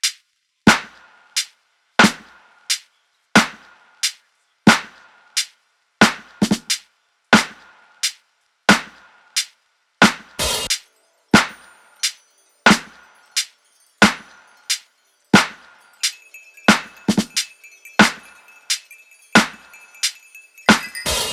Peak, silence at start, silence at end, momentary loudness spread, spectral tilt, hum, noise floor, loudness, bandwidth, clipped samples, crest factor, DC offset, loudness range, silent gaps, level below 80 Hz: 0 dBFS; 0.05 s; 0 s; 11 LU; -3 dB/octave; none; -64 dBFS; -18 LUFS; 16.5 kHz; under 0.1%; 20 dB; under 0.1%; 2 LU; none; -48 dBFS